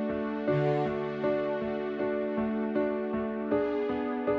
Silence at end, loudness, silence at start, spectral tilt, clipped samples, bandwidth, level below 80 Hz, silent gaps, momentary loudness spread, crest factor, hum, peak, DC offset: 0 s; -30 LUFS; 0 s; -9 dB/octave; under 0.1%; 6.2 kHz; -60 dBFS; none; 4 LU; 14 dB; none; -16 dBFS; under 0.1%